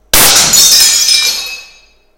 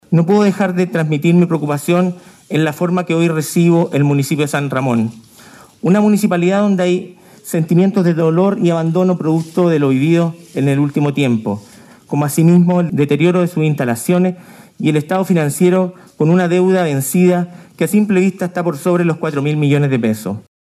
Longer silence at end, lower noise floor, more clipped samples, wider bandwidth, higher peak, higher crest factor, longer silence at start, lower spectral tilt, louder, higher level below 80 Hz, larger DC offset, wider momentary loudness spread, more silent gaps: first, 0.55 s vs 0.35 s; about the same, -43 dBFS vs -41 dBFS; first, 2% vs under 0.1%; first, over 20 kHz vs 14.5 kHz; about the same, 0 dBFS vs -2 dBFS; about the same, 10 dB vs 14 dB; about the same, 0.15 s vs 0.1 s; second, 1 dB/octave vs -7 dB/octave; first, -4 LUFS vs -15 LUFS; first, -34 dBFS vs -64 dBFS; neither; first, 12 LU vs 7 LU; neither